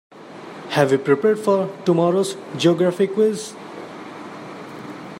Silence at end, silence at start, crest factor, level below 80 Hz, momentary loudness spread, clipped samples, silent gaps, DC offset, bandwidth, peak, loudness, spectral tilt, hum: 0 s; 0.15 s; 18 dB; -68 dBFS; 18 LU; under 0.1%; none; under 0.1%; 16 kHz; -2 dBFS; -19 LUFS; -6 dB/octave; none